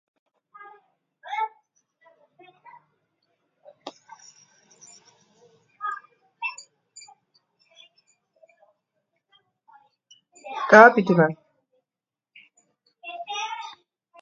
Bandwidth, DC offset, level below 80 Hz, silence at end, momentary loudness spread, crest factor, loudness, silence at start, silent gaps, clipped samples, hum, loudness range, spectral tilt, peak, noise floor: 7.6 kHz; under 0.1%; -78 dBFS; 0.5 s; 31 LU; 26 dB; -20 LUFS; 1.25 s; none; under 0.1%; none; 21 LU; -5.5 dB/octave; 0 dBFS; under -90 dBFS